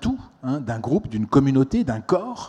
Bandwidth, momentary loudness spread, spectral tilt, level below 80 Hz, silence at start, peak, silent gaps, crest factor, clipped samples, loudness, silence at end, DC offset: 9 kHz; 9 LU; -8 dB/octave; -44 dBFS; 0 s; -4 dBFS; none; 18 dB; under 0.1%; -22 LUFS; 0 s; under 0.1%